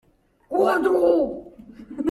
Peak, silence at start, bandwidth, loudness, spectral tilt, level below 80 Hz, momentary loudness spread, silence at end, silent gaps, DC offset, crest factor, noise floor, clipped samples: -6 dBFS; 0.5 s; 14 kHz; -21 LUFS; -6 dB/octave; -56 dBFS; 16 LU; 0 s; none; under 0.1%; 16 dB; -43 dBFS; under 0.1%